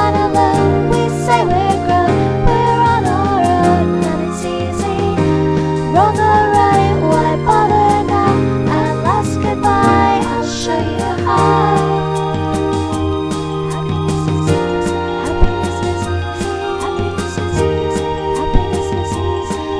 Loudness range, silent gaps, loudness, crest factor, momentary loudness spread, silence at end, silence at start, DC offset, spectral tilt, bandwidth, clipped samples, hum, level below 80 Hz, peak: 5 LU; none; -15 LUFS; 14 dB; 7 LU; 0 s; 0 s; 0.3%; -6.5 dB/octave; 11 kHz; under 0.1%; none; -28 dBFS; 0 dBFS